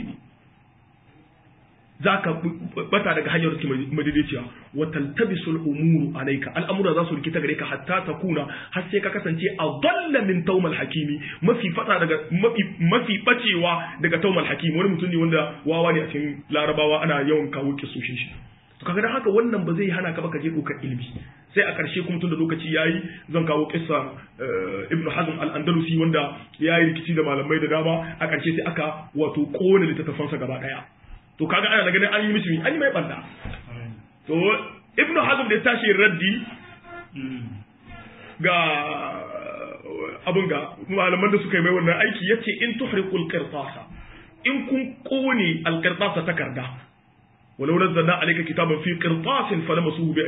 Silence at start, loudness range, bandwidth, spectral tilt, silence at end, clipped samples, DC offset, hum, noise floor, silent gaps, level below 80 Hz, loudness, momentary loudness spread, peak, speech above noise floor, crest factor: 0 s; 4 LU; 4 kHz; -11 dB/octave; 0 s; under 0.1%; under 0.1%; none; -57 dBFS; none; -56 dBFS; -23 LUFS; 14 LU; -4 dBFS; 34 dB; 20 dB